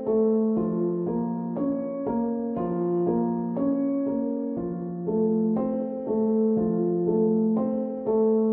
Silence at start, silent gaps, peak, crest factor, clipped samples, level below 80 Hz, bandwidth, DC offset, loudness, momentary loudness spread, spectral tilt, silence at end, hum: 0 s; none; -12 dBFS; 12 dB; under 0.1%; -58 dBFS; 2.4 kHz; under 0.1%; -26 LUFS; 6 LU; -14.5 dB/octave; 0 s; none